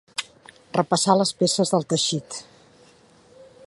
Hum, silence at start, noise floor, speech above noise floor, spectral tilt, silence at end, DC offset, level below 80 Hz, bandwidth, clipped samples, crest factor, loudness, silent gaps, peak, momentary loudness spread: none; 0.2 s; -54 dBFS; 32 dB; -4 dB/octave; 0.25 s; under 0.1%; -68 dBFS; 11.5 kHz; under 0.1%; 22 dB; -22 LUFS; none; -4 dBFS; 17 LU